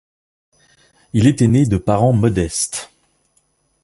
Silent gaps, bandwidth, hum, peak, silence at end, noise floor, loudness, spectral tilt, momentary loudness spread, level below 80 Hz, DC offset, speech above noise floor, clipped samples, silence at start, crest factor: none; 11.5 kHz; none; -2 dBFS; 1 s; -63 dBFS; -16 LUFS; -6 dB/octave; 9 LU; -38 dBFS; under 0.1%; 48 dB; under 0.1%; 1.15 s; 16 dB